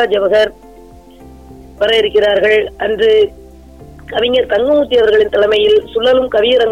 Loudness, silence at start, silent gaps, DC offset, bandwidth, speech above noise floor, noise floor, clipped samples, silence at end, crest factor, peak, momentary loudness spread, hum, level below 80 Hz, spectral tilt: -12 LUFS; 0 s; none; 0.3%; 9.4 kHz; 27 dB; -38 dBFS; under 0.1%; 0 s; 10 dB; -4 dBFS; 6 LU; none; -40 dBFS; -4.5 dB/octave